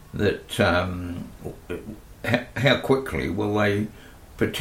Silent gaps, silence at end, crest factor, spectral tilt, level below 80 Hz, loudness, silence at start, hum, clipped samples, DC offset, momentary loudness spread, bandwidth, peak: none; 0 s; 20 dB; -6 dB/octave; -46 dBFS; -24 LUFS; 0 s; none; under 0.1%; under 0.1%; 14 LU; 16.5 kHz; -4 dBFS